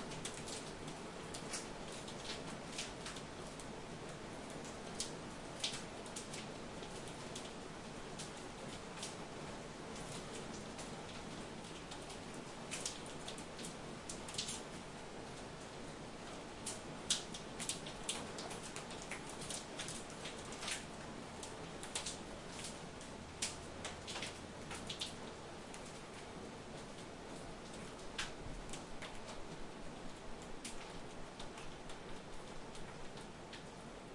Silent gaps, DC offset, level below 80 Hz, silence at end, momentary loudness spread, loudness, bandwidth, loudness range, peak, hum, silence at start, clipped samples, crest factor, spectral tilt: none; under 0.1%; -60 dBFS; 0 s; 8 LU; -47 LUFS; 11.5 kHz; 6 LU; -22 dBFS; none; 0 s; under 0.1%; 26 dB; -3 dB/octave